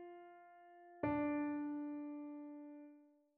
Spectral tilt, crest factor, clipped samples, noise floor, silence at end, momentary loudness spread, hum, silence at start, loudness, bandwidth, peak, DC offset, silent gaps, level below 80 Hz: -7.5 dB/octave; 18 dB; under 0.1%; -66 dBFS; 0.3 s; 22 LU; none; 0 s; -43 LUFS; 3.8 kHz; -26 dBFS; under 0.1%; none; -74 dBFS